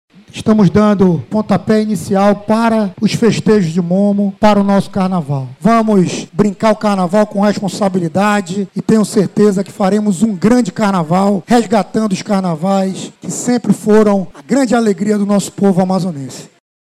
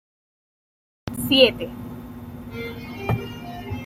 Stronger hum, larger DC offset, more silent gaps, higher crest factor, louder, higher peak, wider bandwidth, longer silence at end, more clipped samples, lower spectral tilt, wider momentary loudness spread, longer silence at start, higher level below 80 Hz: neither; neither; neither; second, 10 dB vs 24 dB; first, -13 LUFS vs -22 LUFS; about the same, -2 dBFS vs -2 dBFS; second, 13 kHz vs 16.5 kHz; first, 0.45 s vs 0 s; neither; first, -6.5 dB/octave vs -5 dB/octave; second, 6 LU vs 21 LU; second, 0.35 s vs 1.05 s; about the same, -46 dBFS vs -48 dBFS